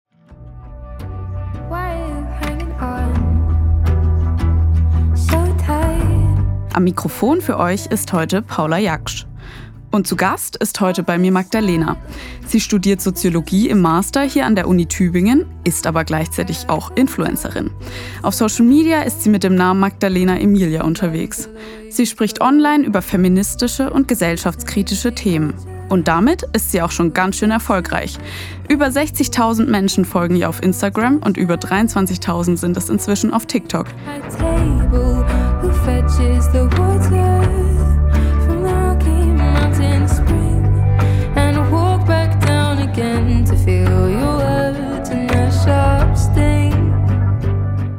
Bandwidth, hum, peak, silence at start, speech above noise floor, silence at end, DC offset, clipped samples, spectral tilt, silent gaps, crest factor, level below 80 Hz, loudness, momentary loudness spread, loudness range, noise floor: 18 kHz; none; 0 dBFS; 0.3 s; 23 dB; 0 s; under 0.1%; under 0.1%; -6 dB/octave; none; 14 dB; -24 dBFS; -16 LUFS; 10 LU; 3 LU; -38 dBFS